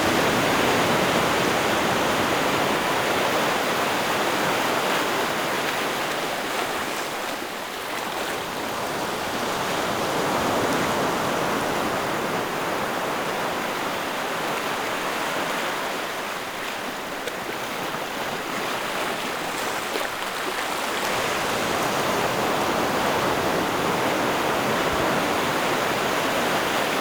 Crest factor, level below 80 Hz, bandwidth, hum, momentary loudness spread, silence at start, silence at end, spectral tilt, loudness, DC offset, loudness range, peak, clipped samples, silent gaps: 16 dB; -52 dBFS; over 20 kHz; none; 7 LU; 0 s; 0 s; -3 dB/octave; -24 LUFS; under 0.1%; 5 LU; -8 dBFS; under 0.1%; none